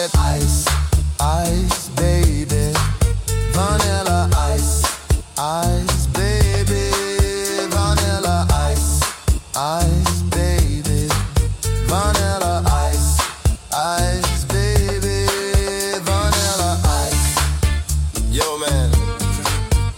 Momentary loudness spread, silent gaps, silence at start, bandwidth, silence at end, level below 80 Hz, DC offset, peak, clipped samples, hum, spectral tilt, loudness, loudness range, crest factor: 4 LU; none; 0 s; 17 kHz; 0 s; -22 dBFS; under 0.1%; -4 dBFS; under 0.1%; none; -4.5 dB/octave; -18 LUFS; 1 LU; 14 dB